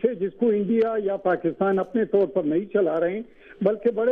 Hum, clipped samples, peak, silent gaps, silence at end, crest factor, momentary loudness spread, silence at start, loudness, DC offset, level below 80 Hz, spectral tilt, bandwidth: none; under 0.1%; -6 dBFS; none; 0 s; 16 dB; 4 LU; 0 s; -23 LUFS; under 0.1%; -62 dBFS; -10 dB/octave; 4.5 kHz